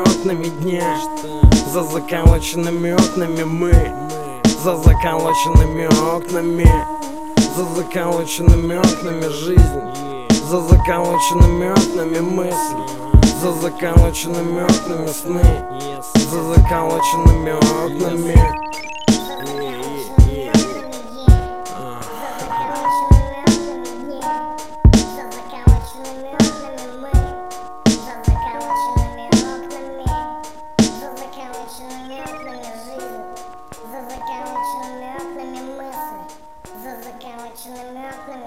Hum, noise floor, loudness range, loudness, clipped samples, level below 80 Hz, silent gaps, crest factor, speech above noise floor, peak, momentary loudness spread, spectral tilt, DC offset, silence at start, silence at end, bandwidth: none; -39 dBFS; 14 LU; -17 LUFS; under 0.1%; -20 dBFS; none; 16 dB; 24 dB; 0 dBFS; 18 LU; -6 dB/octave; 2%; 0 s; 0 s; 16 kHz